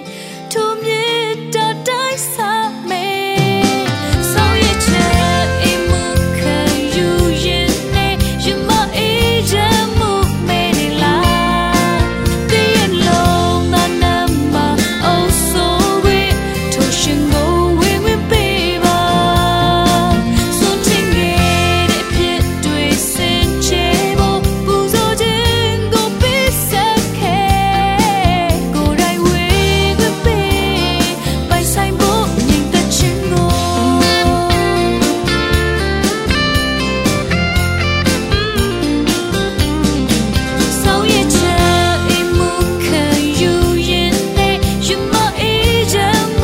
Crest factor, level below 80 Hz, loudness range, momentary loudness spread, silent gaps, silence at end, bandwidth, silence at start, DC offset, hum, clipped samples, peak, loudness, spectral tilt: 14 dB; -24 dBFS; 2 LU; 4 LU; none; 0 s; 16.5 kHz; 0 s; under 0.1%; none; under 0.1%; 0 dBFS; -13 LUFS; -4.5 dB/octave